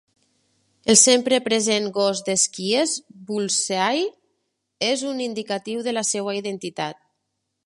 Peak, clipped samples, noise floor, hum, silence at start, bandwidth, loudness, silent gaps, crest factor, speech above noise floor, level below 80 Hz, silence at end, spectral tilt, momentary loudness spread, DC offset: 0 dBFS; under 0.1%; -77 dBFS; none; 0.85 s; 11.5 kHz; -21 LUFS; none; 24 dB; 55 dB; -68 dBFS; 0.7 s; -2 dB/octave; 14 LU; under 0.1%